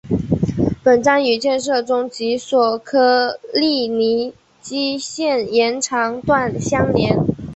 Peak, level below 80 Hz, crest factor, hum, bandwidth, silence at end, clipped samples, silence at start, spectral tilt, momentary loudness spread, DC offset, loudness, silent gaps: -2 dBFS; -42 dBFS; 16 dB; none; 8.4 kHz; 0 s; under 0.1%; 0.05 s; -5 dB/octave; 7 LU; under 0.1%; -17 LUFS; none